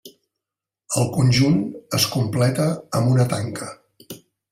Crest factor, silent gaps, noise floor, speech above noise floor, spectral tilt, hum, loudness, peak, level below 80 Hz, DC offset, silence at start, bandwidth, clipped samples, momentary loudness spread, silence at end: 16 dB; none; -87 dBFS; 68 dB; -5.5 dB/octave; none; -20 LUFS; -6 dBFS; -52 dBFS; under 0.1%; 0.05 s; 16 kHz; under 0.1%; 21 LU; 0.35 s